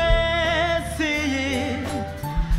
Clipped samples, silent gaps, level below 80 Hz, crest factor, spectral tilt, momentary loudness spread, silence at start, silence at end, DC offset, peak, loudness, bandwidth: under 0.1%; none; -28 dBFS; 16 dB; -5 dB/octave; 8 LU; 0 s; 0 s; under 0.1%; -6 dBFS; -23 LUFS; 16 kHz